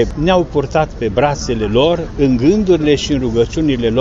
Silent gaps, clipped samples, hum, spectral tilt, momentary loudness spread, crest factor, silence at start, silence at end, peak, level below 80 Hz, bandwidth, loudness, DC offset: none; under 0.1%; none; -6 dB/octave; 4 LU; 12 dB; 0 s; 0 s; -2 dBFS; -28 dBFS; 8 kHz; -14 LUFS; under 0.1%